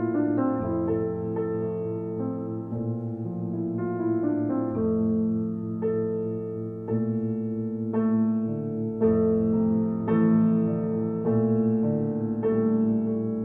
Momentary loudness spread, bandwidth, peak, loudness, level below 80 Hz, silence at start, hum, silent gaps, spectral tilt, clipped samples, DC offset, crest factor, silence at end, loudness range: 8 LU; 2.8 kHz; -12 dBFS; -26 LUFS; -60 dBFS; 0 s; none; none; -13 dB/octave; under 0.1%; under 0.1%; 14 dB; 0 s; 5 LU